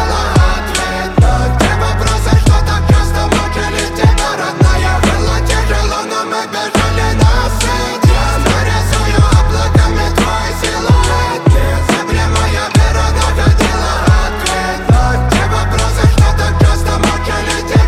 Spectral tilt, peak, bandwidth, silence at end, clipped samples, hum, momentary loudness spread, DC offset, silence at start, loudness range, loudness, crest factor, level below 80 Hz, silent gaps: -5 dB/octave; 0 dBFS; 15.5 kHz; 0 s; under 0.1%; none; 4 LU; under 0.1%; 0 s; 1 LU; -12 LUFS; 10 dB; -14 dBFS; none